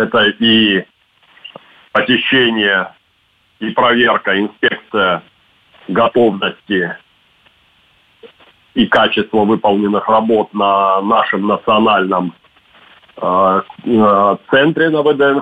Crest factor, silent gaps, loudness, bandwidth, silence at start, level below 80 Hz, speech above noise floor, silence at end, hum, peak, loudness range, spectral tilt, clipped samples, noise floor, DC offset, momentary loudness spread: 12 dB; none; -13 LUFS; 5 kHz; 0 s; -54 dBFS; 44 dB; 0 s; none; -2 dBFS; 4 LU; -7 dB/octave; under 0.1%; -57 dBFS; under 0.1%; 8 LU